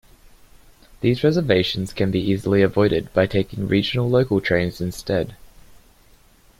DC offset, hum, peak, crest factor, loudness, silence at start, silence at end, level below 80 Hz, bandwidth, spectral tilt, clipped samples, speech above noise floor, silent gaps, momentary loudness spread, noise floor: under 0.1%; none; -2 dBFS; 20 dB; -20 LUFS; 1 s; 1.25 s; -46 dBFS; 16 kHz; -6.5 dB/octave; under 0.1%; 33 dB; none; 6 LU; -53 dBFS